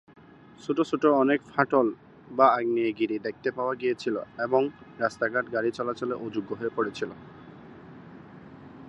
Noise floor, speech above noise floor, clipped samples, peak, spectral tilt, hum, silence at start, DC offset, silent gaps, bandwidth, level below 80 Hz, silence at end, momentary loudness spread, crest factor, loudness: -47 dBFS; 20 dB; under 0.1%; -4 dBFS; -6.5 dB/octave; none; 0.6 s; under 0.1%; none; 8.6 kHz; -68 dBFS; 0 s; 25 LU; 22 dB; -27 LUFS